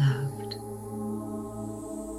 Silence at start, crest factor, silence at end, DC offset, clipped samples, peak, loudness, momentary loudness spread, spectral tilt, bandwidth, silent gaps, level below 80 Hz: 0 s; 16 dB; 0 s; under 0.1%; under 0.1%; -14 dBFS; -34 LUFS; 6 LU; -7 dB/octave; 15 kHz; none; -56 dBFS